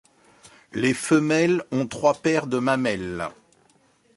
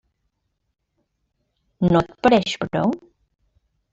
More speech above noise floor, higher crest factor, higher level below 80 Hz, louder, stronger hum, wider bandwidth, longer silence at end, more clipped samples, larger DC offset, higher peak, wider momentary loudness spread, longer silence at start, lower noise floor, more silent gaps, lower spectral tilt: second, 39 dB vs 55 dB; about the same, 18 dB vs 20 dB; second, -58 dBFS vs -50 dBFS; second, -23 LUFS vs -20 LUFS; neither; first, 11.5 kHz vs 7.8 kHz; about the same, 0.85 s vs 0.95 s; neither; neither; about the same, -6 dBFS vs -4 dBFS; first, 11 LU vs 7 LU; second, 0.75 s vs 1.8 s; second, -61 dBFS vs -74 dBFS; neither; about the same, -5.5 dB/octave vs -6.5 dB/octave